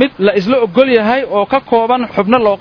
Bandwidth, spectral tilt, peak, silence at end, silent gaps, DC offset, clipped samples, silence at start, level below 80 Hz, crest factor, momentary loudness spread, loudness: 5.4 kHz; -7.5 dB/octave; 0 dBFS; 0 s; none; under 0.1%; 0.3%; 0 s; -48 dBFS; 12 dB; 4 LU; -12 LUFS